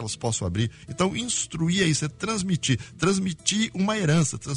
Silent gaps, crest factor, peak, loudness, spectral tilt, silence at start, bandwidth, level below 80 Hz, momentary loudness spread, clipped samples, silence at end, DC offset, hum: none; 20 dB; -6 dBFS; -25 LUFS; -4 dB/octave; 0 s; 11 kHz; -50 dBFS; 6 LU; under 0.1%; 0 s; under 0.1%; none